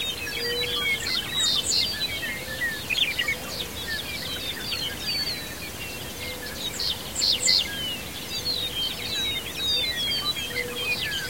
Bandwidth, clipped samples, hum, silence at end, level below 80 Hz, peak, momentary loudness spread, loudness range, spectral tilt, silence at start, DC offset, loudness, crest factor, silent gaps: 16.5 kHz; under 0.1%; none; 0 s; -48 dBFS; -8 dBFS; 10 LU; 5 LU; -1 dB/octave; 0 s; 0.4%; -25 LUFS; 20 dB; none